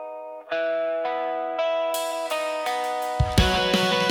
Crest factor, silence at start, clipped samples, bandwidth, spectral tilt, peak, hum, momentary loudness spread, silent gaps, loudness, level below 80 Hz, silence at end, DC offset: 18 dB; 0 s; under 0.1%; 18 kHz; -4.5 dB/octave; -6 dBFS; none; 7 LU; none; -24 LUFS; -36 dBFS; 0 s; under 0.1%